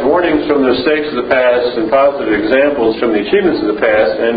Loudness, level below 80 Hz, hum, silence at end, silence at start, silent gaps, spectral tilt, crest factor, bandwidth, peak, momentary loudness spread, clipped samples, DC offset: -12 LUFS; -42 dBFS; none; 0 s; 0 s; none; -8.5 dB/octave; 12 dB; 5 kHz; 0 dBFS; 3 LU; under 0.1%; under 0.1%